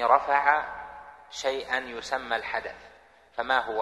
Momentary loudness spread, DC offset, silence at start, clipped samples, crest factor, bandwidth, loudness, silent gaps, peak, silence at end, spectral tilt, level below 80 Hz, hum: 19 LU; under 0.1%; 0 s; under 0.1%; 22 dB; 12.5 kHz; -27 LUFS; none; -6 dBFS; 0 s; -2 dB/octave; -60 dBFS; none